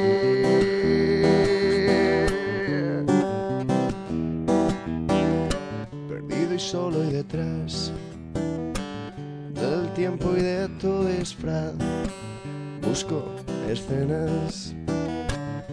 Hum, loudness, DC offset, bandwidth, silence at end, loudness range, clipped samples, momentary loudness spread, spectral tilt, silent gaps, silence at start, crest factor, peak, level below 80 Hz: none; -25 LUFS; under 0.1%; 11 kHz; 0 s; 7 LU; under 0.1%; 12 LU; -6 dB/octave; none; 0 s; 18 dB; -6 dBFS; -42 dBFS